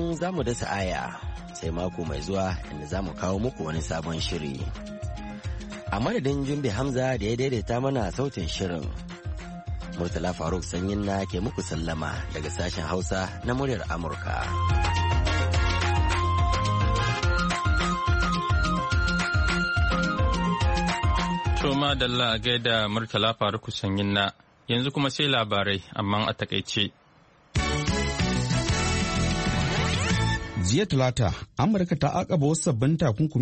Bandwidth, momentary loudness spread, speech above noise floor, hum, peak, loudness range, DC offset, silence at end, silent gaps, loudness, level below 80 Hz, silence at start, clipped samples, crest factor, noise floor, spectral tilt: 8.8 kHz; 9 LU; 31 dB; none; -8 dBFS; 6 LU; under 0.1%; 0 s; none; -26 LUFS; -34 dBFS; 0 s; under 0.1%; 16 dB; -57 dBFS; -5 dB/octave